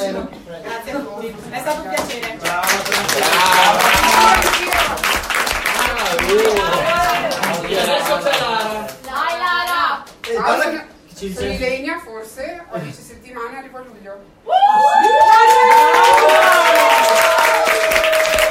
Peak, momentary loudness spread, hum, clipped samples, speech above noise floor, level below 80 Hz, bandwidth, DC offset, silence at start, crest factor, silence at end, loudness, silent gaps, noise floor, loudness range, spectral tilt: 0 dBFS; 19 LU; none; under 0.1%; 10 dB; -40 dBFS; 16.5 kHz; under 0.1%; 0 s; 16 dB; 0 s; -13 LUFS; none; -35 dBFS; 12 LU; -2 dB/octave